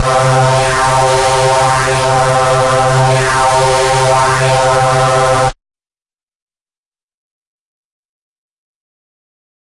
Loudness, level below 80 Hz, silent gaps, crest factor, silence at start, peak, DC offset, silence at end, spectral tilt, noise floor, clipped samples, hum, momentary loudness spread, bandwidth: -10 LUFS; -34 dBFS; none; 12 dB; 0 s; -2 dBFS; under 0.1%; 4.15 s; -4 dB/octave; under -90 dBFS; under 0.1%; none; 1 LU; 11.5 kHz